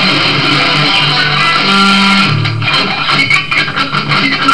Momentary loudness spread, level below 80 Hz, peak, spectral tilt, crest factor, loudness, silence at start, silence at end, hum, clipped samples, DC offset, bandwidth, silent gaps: 4 LU; -42 dBFS; 0 dBFS; -4 dB/octave; 10 dB; -9 LUFS; 0 s; 0 s; none; under 0.1%; 4%; 11 kHz; none